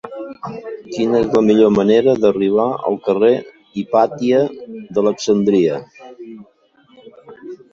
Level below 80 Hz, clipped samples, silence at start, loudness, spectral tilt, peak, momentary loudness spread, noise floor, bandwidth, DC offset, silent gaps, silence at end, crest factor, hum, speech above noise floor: -54 dBFS; under 0.1%; 0.05 s; -15 LUFS; -6.5 dB/octave; -2 dBFS; 20 LU; -53 dBFS; 7.4 kHz; under 0.1%; none; 0.15 s; 16 dB; none; 38 dB